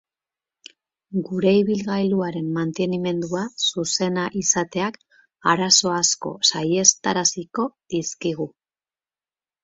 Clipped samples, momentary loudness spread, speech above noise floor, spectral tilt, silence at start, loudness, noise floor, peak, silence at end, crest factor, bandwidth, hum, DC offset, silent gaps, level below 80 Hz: under 0.1%; 11 LU; over 68 dB; -3 dB/octave; 1.1 s; -21 LUFS; under -90 dBFS; 0 dBFS; 1.15 s; 22 dB; 8 kHz; none; under 0.1%; none; -64 dBFS